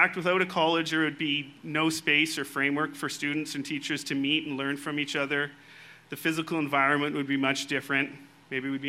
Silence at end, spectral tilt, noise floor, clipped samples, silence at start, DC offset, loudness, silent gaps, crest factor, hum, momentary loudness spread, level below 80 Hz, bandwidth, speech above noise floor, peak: 0 s; -4 dB/octave; -51 dBFS; under 0.1%; 0 s; under 0.1%; -28 LUFS; none; 22 dB; none; 8 LU; -76 dBFS; 16 kHz; 23 dB; -6 dBFS